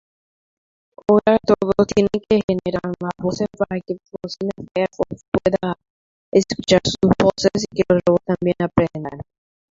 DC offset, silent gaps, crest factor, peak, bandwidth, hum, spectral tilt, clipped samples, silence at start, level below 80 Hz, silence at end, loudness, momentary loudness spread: under 0.1%; 2.44-2.48 s, 5.28-5.32 s, 5.90-6.32 s; 18 dB; -2 dBFS; 7.8 kHz; none; -6 dB/octave; under 0.1%; 1.1 s; -46 dBFS; 0.5 s; -19 LUFS; 11 LU